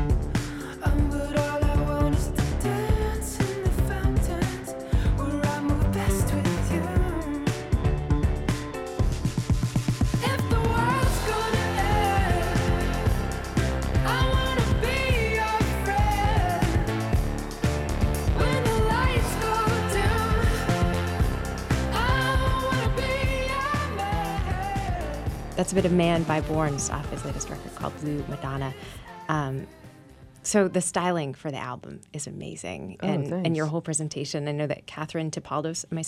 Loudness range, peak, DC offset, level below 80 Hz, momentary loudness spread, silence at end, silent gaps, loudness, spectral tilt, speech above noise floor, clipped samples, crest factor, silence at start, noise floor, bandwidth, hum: 5 LU; -8 dBFS; under 0.1%; -30 dBFS; 9 LU; 0 s; none; -26 LUFS; -5.5 dB/octave; 21 dB; under 0.1%; 16 dB; 0 s; -49 dBFS; 16 kHz; none